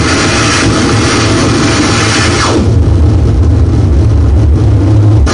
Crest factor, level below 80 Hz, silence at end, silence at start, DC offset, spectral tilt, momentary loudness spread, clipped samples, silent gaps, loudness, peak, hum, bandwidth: 6 dB; -14 dBFS; 0 s; 0 s; 1%; -5 dB/octave; 1 LU; under 0.1%; none; -8 LUFS; 0 dBFS; none; 10.5 kHz